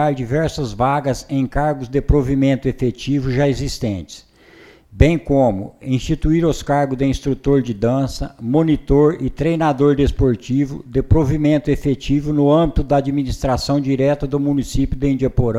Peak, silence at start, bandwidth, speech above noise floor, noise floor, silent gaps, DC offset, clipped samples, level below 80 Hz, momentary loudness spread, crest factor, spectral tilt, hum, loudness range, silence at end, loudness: 0 dBFS; 0 s; 13.5 kHz; 29 dB; -46 dBFS; none; under 0.1%; under 0.1%; -28 dBFS; 6 LU; 16 dB; -7.5 dB/octave; none; 3 LU; 0 s; -18 LUFS